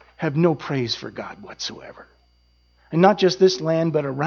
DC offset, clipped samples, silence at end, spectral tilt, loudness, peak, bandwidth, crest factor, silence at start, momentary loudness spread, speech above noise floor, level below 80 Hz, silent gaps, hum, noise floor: under 0.1%; under 0.1%; 0 s; -6 dB/octave; -21 LUFS; -2 dBFS; 7 kHz; 20 dB; 0.2 s; 17 LU; 39 dB; -60 dBFS; none; 60 Hz at -50 dBFS; -60 dBFS